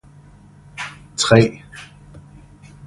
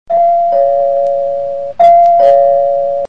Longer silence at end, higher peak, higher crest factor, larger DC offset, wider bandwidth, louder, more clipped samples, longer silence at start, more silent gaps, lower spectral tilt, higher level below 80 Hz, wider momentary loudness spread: first, 0.7 s vs 0 s; about the same, 0 dBFS vs 0 dBFS; first, 22 dB vs 10 dB; second, under 0.1% vs 2%; first, 11.5 kHz vs 5.4 kHz; second, -17 LUFS vs -10 LUFS; neither; first, 0.8 s vs 0.1 s; neither; about the same, -5 dB/octave vs -5.5 dB/octave; about the same, -48 dBFS vs -52 dBFS; first, 25 LU vs 9 LU